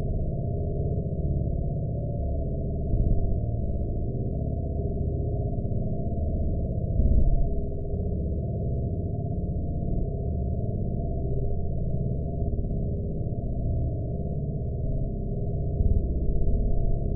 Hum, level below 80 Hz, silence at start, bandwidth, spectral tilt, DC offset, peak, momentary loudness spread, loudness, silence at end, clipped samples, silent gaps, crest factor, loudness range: none; -30 dBFS; 0 s; 0.8 kHz; -19 dB/octave; under 0.1%; -10 dBFS; 4 LU; -30 LUFS; 0 s; under 0.1%; none; 16 dB; 2 LU